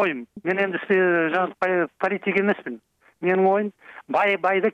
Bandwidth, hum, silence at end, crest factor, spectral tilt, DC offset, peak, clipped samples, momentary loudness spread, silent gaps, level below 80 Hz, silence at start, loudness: 6.6 kHz; none; 0 s; 14 dB; -7.5 dB/octave; under 0.1%; -8 dBFS; under 0.1%; 9 LU; none; -72 dBFS; 0 s; -22 LUFS